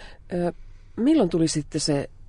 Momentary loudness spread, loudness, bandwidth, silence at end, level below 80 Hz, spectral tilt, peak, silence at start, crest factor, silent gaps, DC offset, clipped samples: 10 LU; -24 LUFS; 11 kHz; 0.05 s; -44 dBFS; -5.5 dB/octave; -10 dBFS; 0 s; 16 dB; none; under 0.1%; under 0.1%